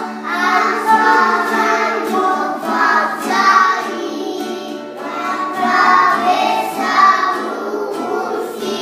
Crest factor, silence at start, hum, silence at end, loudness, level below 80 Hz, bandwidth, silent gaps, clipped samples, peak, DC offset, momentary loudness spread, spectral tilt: 16 dB; 0 s; none; 0 s; -15 LUFS; -78 dBFS; 15.5 kHz; none; under 0.1%; 0 dBFS; under 0.1%; 12 LU; -3 dB/octave